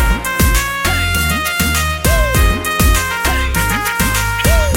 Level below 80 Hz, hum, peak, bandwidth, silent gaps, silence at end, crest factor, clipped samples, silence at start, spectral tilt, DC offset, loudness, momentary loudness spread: -18 dBFS; none; 0 dBFS; 17 kHz; none; 0 s; 12 dB; under 0.1%; 0 s; -3.5 dB/octave; under 0.1%; -14 LUFS; 2 LU